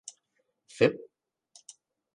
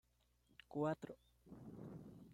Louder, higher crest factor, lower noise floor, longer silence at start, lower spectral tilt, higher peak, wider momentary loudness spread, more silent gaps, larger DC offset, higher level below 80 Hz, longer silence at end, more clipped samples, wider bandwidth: first, -27 LUFS vs -48 LUFS; first, 26 dB vs 20 dB; about the same, -77 dBFS vs -78 dBFS; first, 0.8 s vs 0.5 s; second, -5 dB/octave vs -8 dB/octave; first, -8 dBFS vs -28 dBFS; first, 25 LU vs 21 LU; neither; neither; about the same, -72 dBFS vs -76 dBFS; first, 1.2 s vs 0 s; neither; second, 10.5 kHz vs 15.5 kHz